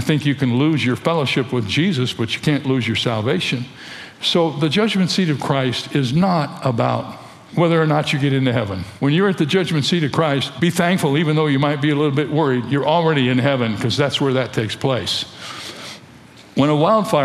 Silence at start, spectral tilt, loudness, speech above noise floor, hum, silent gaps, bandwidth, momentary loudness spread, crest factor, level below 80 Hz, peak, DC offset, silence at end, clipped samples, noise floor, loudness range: 0 s; -6 dB/octave; -18 LUFS; 25 dB; none; none; 14 kHz; 9 LU; 16 dB; -56 dBFS; -2 dBFS; under 0.1%; 0 s; under 0.1%; -43 dBFS; 2 LU